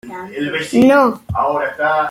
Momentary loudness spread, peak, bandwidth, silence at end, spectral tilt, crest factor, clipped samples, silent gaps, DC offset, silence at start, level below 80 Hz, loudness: 11 LU; -2 dBFS; 16 kHz; 0 s; -6 dB/octave; 14 dB; under 0.1%; none; under 0.1%; 0.05 s; -48 dBFS; -15 LUFS